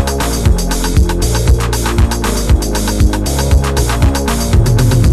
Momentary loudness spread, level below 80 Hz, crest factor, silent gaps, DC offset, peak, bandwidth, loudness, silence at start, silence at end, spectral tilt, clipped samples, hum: 4 LU; -14 dBFS; 12 dB; none; under 0.1%; 0 dBFS; 14 kHz; -13 LUFS; 0 s; 0 s; -5 dB/octave; under 0.1%; none